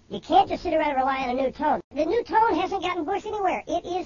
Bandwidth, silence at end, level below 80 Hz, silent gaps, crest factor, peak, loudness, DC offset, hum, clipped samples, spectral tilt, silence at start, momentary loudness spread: 7.4 kHz; 0 s; -52 dBFS; 1.84-1.91 s; 18 dB; -6 dBFS; -24 LUFS; under 0.1%; none; under 0.1%; -5 dB/octave; 0.1 s; 6 LU